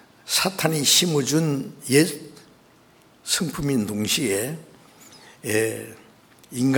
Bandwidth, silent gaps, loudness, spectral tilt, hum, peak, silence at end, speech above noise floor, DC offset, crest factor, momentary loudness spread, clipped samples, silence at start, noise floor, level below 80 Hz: over 20 kHz; none; -22 LUFS; -3.5 dB/octave; none; -2 dBFS; 0 s; 32 dB; under 0.1%; 22 dB; 19 LU; under 0.1%; 0.25 s; -54 dBFS; -56 dBFS